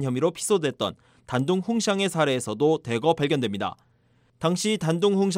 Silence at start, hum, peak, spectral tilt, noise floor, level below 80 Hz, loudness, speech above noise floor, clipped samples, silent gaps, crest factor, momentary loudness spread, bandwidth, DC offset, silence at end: 0 s; none; -8 dBFS; -5 dB/octave; -63 dBFS; -64 dBFS; -25 LUFS; 39 dB; under 0.1%; none; 16 dB; 7 LU; 16 kHz; under 0.1%; 0 s